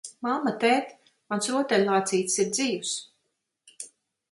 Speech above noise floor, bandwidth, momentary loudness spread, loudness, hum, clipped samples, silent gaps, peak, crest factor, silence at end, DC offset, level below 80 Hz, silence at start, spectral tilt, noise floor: 53 dB; 11.5 kHz; 19 LU; -26 LUFS; none; under 0.1%; none; -8 dBFS; 20 dB; 0.45 s; under 0.1%; -74 dBFS; 0.05 s; -3 dB/octave; -78 dBFS